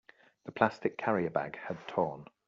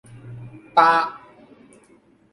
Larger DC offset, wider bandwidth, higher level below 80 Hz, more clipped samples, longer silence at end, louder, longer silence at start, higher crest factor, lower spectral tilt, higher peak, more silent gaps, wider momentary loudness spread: neither; second, 7.6 kHz vs 11.5 kHz; second, -74 dBFS vs -64 dBFS; neither; second, 0.25 s vs 1.15 s; second, -33 LUFS vs -18 LUFS; first, 0.45 s vs 0.25 s; about the same, 24 dB vs 22 dB; about the same, -5 dB/octave vs -5 dB/octave; second, -10 dBFS vs -2 dBFS; neither; second, 12 LU vs 24 LU